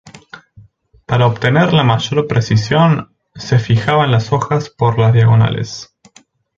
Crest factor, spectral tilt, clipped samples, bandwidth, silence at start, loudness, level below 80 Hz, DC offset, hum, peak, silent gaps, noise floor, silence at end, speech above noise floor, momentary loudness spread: 14 dB; -6.5 dB/octave; under 0.1%; 7.4 kHz; 0.05 s; -13 LUFS; -44 dBFS; under 0.1%; none; 0 dBFS; none; -49 dBFS; 0.75 s; 37 dB; 8 LU